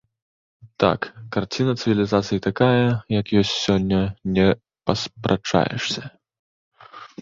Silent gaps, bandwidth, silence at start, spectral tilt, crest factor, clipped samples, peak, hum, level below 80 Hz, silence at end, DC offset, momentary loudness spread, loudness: 6.39-6.71 s; 7.6 kHz; 0.65 s; -6 dB/octave; 20 dB; under 0.1%; -2 dBFS; none; -46 dBFS; 0.15 s; under 0.1%; 8 LU; -21 LUFS